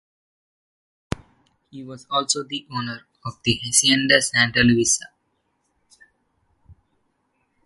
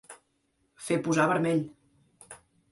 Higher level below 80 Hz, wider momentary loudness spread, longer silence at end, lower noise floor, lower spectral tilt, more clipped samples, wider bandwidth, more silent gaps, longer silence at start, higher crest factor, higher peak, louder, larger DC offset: first, -50 dBFS vs -70 dBFS; second, 19 LU vs 24 LU; first, 0.9 s vs 0.35 s; about the same, -71 dBFS vs -73 dBFS; second, -2.5 dB/octave vs -5.5 dB/octave; neither; about the same, 12 kHz vs 11.5 kHz; neither; first, 1.75 s vs 0.1 s; about the same, 24 dB vs 20 dB; first, -2 dBFS vs -12 dBFS; first, -19 LUFS vs -27 LUFS; neither